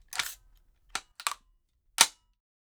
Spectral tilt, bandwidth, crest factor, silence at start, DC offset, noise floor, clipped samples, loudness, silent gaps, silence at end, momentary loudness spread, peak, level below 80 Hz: 2.5 dB/octave; over 20 kHz; 32 dB; 0.1 s; under 0.1%; -69 dBFS; under 0.1%; -29 LUFS; none; 0.65 s; 18 LU; -2 dBFS; -66 dBFS